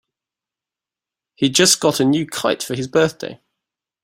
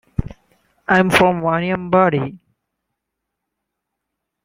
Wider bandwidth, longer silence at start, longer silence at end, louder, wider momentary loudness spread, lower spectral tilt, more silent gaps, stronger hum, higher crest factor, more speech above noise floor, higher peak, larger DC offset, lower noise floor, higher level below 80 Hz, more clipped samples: about the same, 16.5 kHz vs 16.5 kHz; first, 1.4 s vs 0.2 s; second, 0.7 s vs 2.1 s; about the same, -17 LUFS vs -16 LUFS; second, 10 LU vs 15 LU; second, -3 dB/octave vs -6 dB/octave; neither; neither; about the same, 20 dB vs 20 dB; first, 71 dB vs 63 dB; about the same, 0 dBFS vs 0 dBFS; neither; first, -88 dBFS vs -79 dBFS; second, -58 dBFS vs -42 dBFS; neither